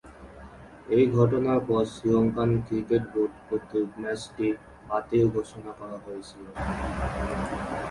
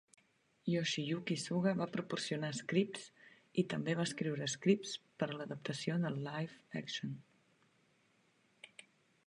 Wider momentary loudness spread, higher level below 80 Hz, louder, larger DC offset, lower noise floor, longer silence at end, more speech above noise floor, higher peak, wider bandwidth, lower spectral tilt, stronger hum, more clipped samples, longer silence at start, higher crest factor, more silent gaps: first, 17 LU vs 11 LU; first, -44 dBFS vs -80 dBFS; first, -27 LUFS vs -38 LUFS; neither; second, -46 dBFS vs -74 dBFS; second, 0 s vs 0.6 s; second, 20 dB vs 36 dB; first, -8 dBFS vs -18 dBFS; about the same, 11.5 kHz vs 11 kHz; first, -8 dB/octave vs -5 dB/octave; neither; neither; second, 0.05 s vs 0.65 s; about the same, 20 dB vs 20 dB; neither